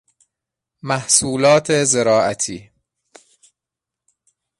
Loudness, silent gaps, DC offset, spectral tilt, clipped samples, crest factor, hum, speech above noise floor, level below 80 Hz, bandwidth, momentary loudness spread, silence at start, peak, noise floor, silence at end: -16 LUFS; none; under 0.1%; -3 dB/octave; under 0.1%; 20 dB; none; 69 dB; -56 dBFS; 11.5 kHz; 11 LU; 0.85 s; 0 dBFS; -85 dBFS; 2 s